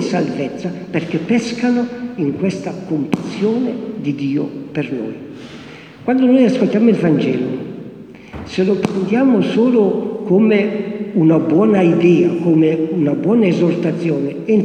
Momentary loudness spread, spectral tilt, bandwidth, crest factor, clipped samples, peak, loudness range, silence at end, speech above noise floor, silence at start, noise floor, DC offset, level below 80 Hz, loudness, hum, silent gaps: 13 LU; -7.5 dB/octave; 9.4 kHz; 14 dB; under 0.1%; 0 dBFS; 7 LU; 0 s; 21 dB; 0 s; -36 dBFS; under 0.1%; -54 dBFS; -16 LUFS; none; none